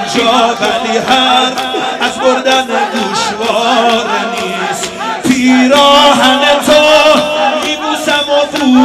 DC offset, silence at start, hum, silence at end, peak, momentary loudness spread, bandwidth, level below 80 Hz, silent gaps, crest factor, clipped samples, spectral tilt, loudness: under 0.1%; 0 s; none; 0 s; 0 dBFS; 10 LU; 16 kHz; -46 dBFS; none; 10 dB; 0.4%; -2.5 dB/octave; -9 LUFS